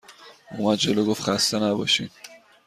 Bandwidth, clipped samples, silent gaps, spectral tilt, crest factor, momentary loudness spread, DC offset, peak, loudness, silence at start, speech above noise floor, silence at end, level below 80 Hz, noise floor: 15 kHz; under 0.1%; none; -3.5 dB/octave; 16 dB; 8 LU; under 0.1%; -8 dBFS; -22 LUFS; 0.1 s; 25 dB; 0.3 s; -62 dBFS; -47 dBFS